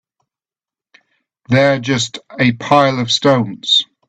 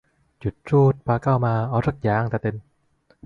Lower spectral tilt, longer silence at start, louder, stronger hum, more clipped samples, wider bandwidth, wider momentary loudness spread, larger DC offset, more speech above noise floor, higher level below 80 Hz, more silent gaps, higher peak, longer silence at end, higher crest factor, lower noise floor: second, -4.5 dB/octave vs -10 dB/octave; first, 1.5 s vs 0.45 s; first, -14 LUFS vs -22 LUFS; neither; neither; first, 9.2 kHz vs 6 kHz; second, 5 LU vs 13 LU; neither; first, over 76 dB vs 41 dB; second, -54 dBFS vs -48 dBFS; neither; first, 0 dBFS vs -6 dBFS; second, 0.25 s vs 0.65 s; about the same, 16 dB vs 16 dB; first, under -90 dBFS vs -62 dBFS